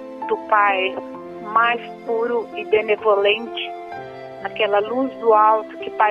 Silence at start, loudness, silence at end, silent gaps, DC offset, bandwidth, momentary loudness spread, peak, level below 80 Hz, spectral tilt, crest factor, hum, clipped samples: 0 s; -19 LUFS; 0 s; none; under 0.1%; 5.8 kHz; 16 LU; -2 dBFS; -64 dBFS; -5.5 dB/octave; 18 dB; none; under 0.1%